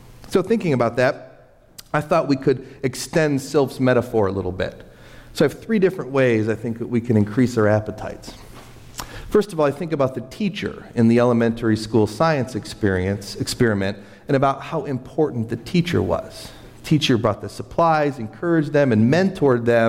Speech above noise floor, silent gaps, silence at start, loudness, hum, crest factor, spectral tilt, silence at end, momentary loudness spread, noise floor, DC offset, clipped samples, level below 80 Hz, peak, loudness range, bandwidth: 30 dB; none; 0.05 s; -20 LUFS; none; 14 dB; -6.5 dB/octave; 0 s; 11 LU; -49 dBFS; under 0.1%; under 0.1%; -48 dBFS; -6 dBFS; 3 LU; 16 kHz